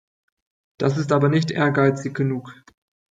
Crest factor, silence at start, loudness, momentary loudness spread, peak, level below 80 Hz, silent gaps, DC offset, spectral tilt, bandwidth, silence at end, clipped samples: 18 dB; 0.8 s; -21 LUFS; 7 LU; -4 dBFS; -62 dBFS; none; under 0.1%; -7 dB/octave; 7.8 kHz; 0.6 s; under 0.1%